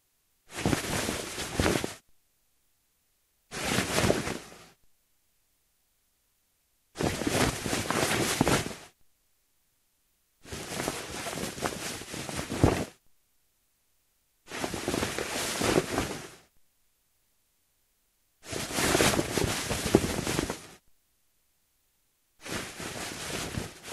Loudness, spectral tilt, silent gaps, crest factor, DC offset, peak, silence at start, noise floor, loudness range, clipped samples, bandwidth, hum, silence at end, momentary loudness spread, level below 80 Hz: -30 LUFS; -3.5 dB/octave; none; 30 dB; under 0.1%; -4 dBFS; 0.5 s; -73 dBFS; 8 LU; under 0.1%; 15.5 kHz; none; 0 s; 15 LU; -50 dBFS